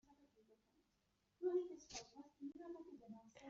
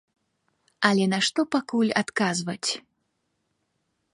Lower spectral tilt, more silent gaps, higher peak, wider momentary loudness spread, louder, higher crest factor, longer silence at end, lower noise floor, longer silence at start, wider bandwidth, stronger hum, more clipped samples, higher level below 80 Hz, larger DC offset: about the same, -4 dB/octave vs -4 dB/octave; neither; second, -32 dBFS vs -6 dBFS; first, 17 LU vs 7 LU; second, -49 LUFS vs -24 LUFS; about the same, 20 dB vs 22 dB; second, 0 s vs 1.35 s; first, -84 dBFS vs -76 dBFS; second, 0.1 s vs 0.8 s; second, 7.6 kHz vs 11.5 kHz; first, 50 Hz at -90 dBFS vs none; neither; second, -84 dBFS vs -72 dBFS; neither